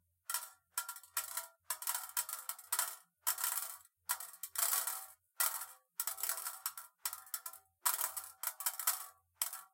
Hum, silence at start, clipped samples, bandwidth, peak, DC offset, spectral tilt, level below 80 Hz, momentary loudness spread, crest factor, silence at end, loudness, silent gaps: none; 0.3 s; under 0.1%; 17 kHz; -16 dBFS; under 0.1%; 4.5 dB/octave; under -90 dBFS; 10 LU; 26 dB; 0.05 s; -38 LUFS; none